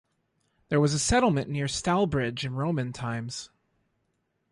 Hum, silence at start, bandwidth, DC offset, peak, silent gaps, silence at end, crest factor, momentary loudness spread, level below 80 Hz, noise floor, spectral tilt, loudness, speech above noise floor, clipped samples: none; 0.7 s; 11.5 kHz; under 0.1%; -10 dBFS; none; 1.05 s; 18 dB; 10 LU; -48 dBFS; -76 dBFS; -5 dB/octave; -27 LUFS; 49 dB; under 0.1%